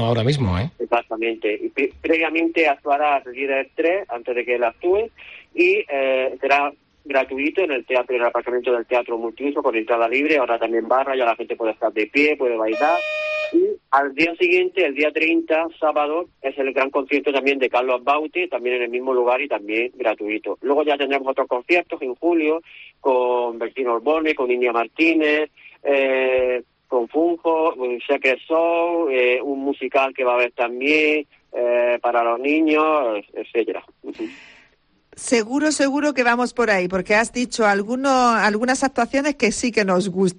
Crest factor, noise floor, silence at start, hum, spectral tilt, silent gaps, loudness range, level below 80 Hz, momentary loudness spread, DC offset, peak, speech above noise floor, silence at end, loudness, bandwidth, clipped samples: 16 dB; -59 dBFS; 0 s; none; -5 dB/octave; none; 2 LU; -58 dBFS; 7 LU; under 0.1%; -4 dBFS; 39 dB; 0.05 s; -20 LUFS; 10 kHz; under 0.1%